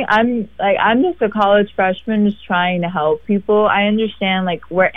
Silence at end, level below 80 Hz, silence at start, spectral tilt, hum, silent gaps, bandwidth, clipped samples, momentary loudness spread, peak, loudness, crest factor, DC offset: 0.05 s; -48 dBFS; 0 s; -8 dB/octave; none; none; 6 kHz; under 0.1%; 5 LU; -2 dBFS; -16 LUFS; 14 dB; 0.6%